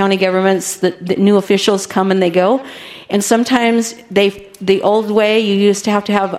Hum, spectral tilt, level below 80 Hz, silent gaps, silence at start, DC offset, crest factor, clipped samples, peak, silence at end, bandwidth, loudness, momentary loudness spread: none; -4.5 dB/octave; -58 dBFS; none; 0 s; under 0.1%; 14 dB; under 0.1%; 0 dBFS; 0 s; 15.5 kHz; -14 LUFS; 6 LU